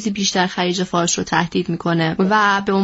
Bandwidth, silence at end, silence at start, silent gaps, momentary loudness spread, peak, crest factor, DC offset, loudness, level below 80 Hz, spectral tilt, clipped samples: 8 kHz; 0 s; 0 s; none; 5 LU; -2 dBFS; 16 dB; under 0.1%; -18 LUFS; -52 dBFS; -3.5 dB/octave; under 0.1%